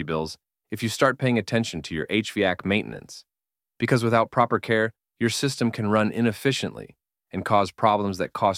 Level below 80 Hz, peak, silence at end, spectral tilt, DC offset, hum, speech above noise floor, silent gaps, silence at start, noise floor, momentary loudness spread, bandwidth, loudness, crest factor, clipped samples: -58 dBFS; -4 dBFS; 0 s; -5.5 dB/octave; under 0.1%; none; over 66 dB; none; 0 s; under -90 dBFS; 14 LU; 16 kHz; -24 LUFS; 20 dB; under 0.1%